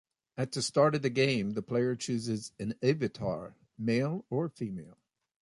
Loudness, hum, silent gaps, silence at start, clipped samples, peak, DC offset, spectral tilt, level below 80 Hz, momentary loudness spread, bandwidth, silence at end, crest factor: -32 LUFS; none; none; 0.35 s; under 0.1%; -12 dBFS; under 0.1%; -5.5 dB/octave; -66 dBFS; 13 LU; 11.5 kHz; 0.5 s; 20 dB